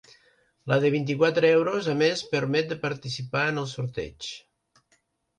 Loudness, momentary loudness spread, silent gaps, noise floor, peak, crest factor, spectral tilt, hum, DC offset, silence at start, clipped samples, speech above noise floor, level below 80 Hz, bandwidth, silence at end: -25 LUFS; 14 LU; none; -69 dBFS; -10 dBFS; 18 dB; -5.5 dB/octave; none; under 0.1%; 0.65 s; under 0.1%; 44 dB; -60 dBFS; 10 kHz; 1 s